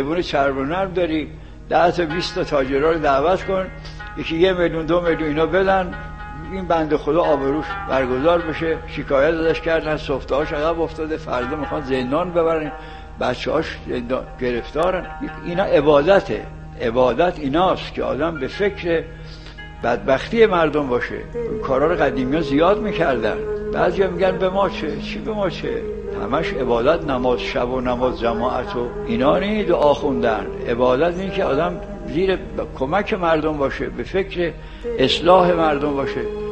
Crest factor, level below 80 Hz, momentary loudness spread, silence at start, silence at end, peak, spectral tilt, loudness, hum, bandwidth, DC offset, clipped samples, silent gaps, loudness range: 20 dB; -36 dBFS; 10 LU; 0 s; 0 s; 0 dBFS; -6.5 dB/octave; -20 LUFS; none; 8.6 kHz; 0.4%; under 0.1%; none; 3 LU